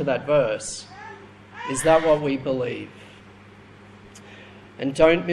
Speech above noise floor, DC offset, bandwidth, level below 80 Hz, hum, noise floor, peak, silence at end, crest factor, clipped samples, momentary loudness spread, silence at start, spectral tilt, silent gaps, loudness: 26 dB; under 0.1%; 12.5 kHz; -52 dBFS; none; -47 dBFS; -4 dBFS; 0 s; 20 dB; under 0.1%; 25 LU; 0 s; -5 dB/octave; none; -22 LUFS